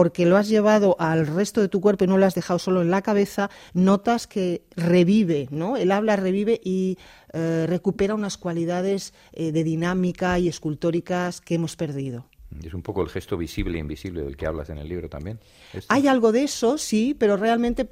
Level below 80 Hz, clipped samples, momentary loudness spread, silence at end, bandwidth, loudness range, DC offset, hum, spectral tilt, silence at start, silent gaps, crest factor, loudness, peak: -46 dBFS; under 0.1%; 14 LU; 0.05 s; 15.5 kHz; 8 LU; under 0.1%; none; -6.5 dB/octave; 0 s; none; 18 dB; -23 LUFS; -4 dBFS